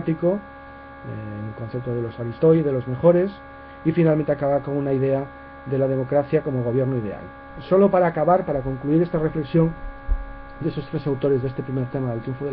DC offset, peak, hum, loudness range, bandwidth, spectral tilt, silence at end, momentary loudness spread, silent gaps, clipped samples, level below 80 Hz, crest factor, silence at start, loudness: under 0.1%; -4 dBFS; none; 3 LU; 4.9 kHz; -12.5 dB/octave; 0 s; 17 LU; none; under 0.1%; -38 dBFS; 18 dB; 0 s; -22 LUFS